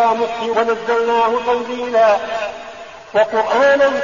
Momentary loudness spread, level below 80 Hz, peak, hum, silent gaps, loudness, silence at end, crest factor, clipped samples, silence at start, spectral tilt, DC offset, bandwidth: 12 LU; -54 dBFS; -4 dBFS; none; none; -16 LUFS; 0 s; 12 dB; under 0.1%; 0 s; -1 dB/octave; 0.3%; 7.4 kHz